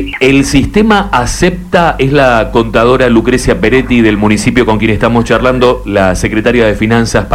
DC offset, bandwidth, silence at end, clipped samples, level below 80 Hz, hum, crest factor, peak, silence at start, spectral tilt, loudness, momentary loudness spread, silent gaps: 0.1%; 15.5 kHz; 0 s; 0.8%; -22 dBFS; none; 8 dB; 0 dBFS; 0 s; -5.5 dB/octave; -9 LUFS; 3 LU; none